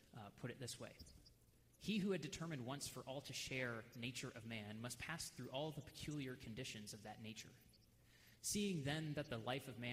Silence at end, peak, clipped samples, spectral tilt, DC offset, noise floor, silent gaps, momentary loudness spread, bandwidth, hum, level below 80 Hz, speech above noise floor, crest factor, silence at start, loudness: 0 s; -32 dBFS; under 0.1%; -4 dB/octave; under 0.1%; -72 dBFS; none; 11 LU; 15.5 kHz; none; -72 dBFS; 24 dB; 18 dB; 0 s; -48 LUFS